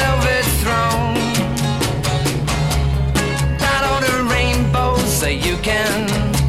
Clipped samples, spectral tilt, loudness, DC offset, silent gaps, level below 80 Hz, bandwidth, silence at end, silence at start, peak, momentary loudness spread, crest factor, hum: under 0.1%; -4.5 dB/octave; -17 LUFS; 0.6%; none; -24 dBFS; 16.5 kHz; 0 s; 0 s; -4 dBFS; 3 LU; 14 dB; none